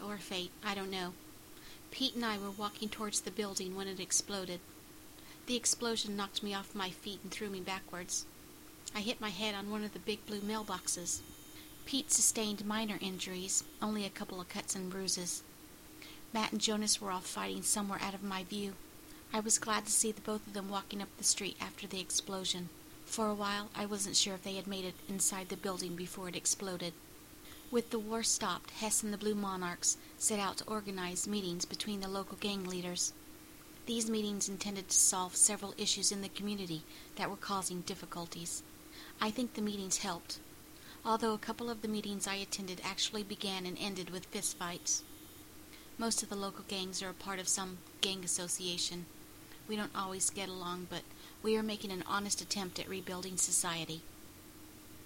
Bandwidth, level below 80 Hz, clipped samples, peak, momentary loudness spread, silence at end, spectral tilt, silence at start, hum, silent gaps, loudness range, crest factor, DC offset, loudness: 16.5 kHz; -64 dBFS; under 0.1%; -10 dBFS; 20 LU; 0 s; -2 dB/octave; 0 s; none; none; 5 LU; 28 dB; under 0.1%; -36 LUFS